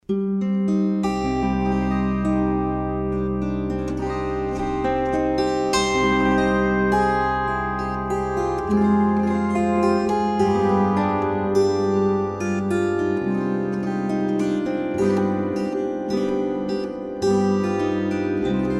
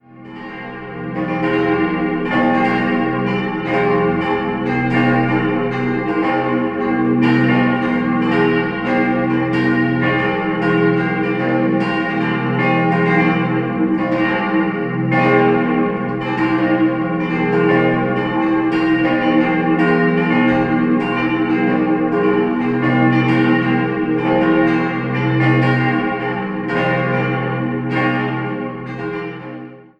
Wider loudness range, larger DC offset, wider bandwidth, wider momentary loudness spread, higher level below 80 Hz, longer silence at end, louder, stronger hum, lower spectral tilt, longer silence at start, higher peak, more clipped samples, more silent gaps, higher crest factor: about the same, 3 LU vs 2 LU; neither; first, 11.5 kHz vs 6 kHz; about the same, 6 LU vs 6 LU; first, -38 dBFS vs -46 dBFS; second, 0 s vs 0.2 s; second, -22 LUFS vs -16 LUFS; neither; second, -6.5 dB/octave vs -8.5 dB/octave; about the same, 0.1 s vs 0.1 s; second, -8 dBFS vs -2 dBFS; neither; neither; about the same, 14 dB vs 14 dB